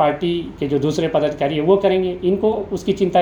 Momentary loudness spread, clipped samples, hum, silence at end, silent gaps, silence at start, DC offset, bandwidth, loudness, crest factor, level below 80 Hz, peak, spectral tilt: 7 LU; under 0.1%; none; 0 s; none; 0 s; under 0.1%; 10.5 kHz; -19 LUFS; 16 dB; -46 dBFS; -2 dBFS; -7 dB/octave